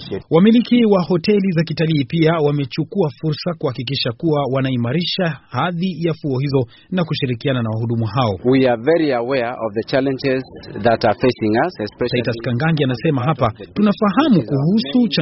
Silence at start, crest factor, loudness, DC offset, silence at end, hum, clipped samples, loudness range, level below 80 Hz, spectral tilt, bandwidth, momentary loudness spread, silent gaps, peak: 0 s; 16 dB; -18 LUFS; under 0.1%; 0 s; none; under 0.1%; 3 LU; -50 dBFS; -5.5 dB/octave; 6 kHz; 7 LU; none; 0 dBFS